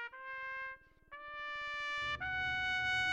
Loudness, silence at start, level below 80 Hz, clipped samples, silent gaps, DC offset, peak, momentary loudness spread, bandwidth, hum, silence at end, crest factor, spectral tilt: -38 LUFS; 0 s; -62 dBFS; under 0.1%; none; under 0.1%; -24 dBFS; 15 LU; 12 kHz; none; 0 s; 16 dB; -2 dB/octave